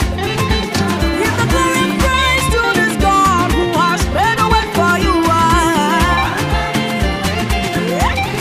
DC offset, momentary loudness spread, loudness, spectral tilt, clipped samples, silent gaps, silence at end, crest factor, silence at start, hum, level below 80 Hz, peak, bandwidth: under 0.1%; 5 LU; -14 LUFS; -4.5 dB/octave; under 0.1%; none; 0 s; 14 dB; 0 s; none; -24 dBFS; 0 dBFS; 15.5 kHz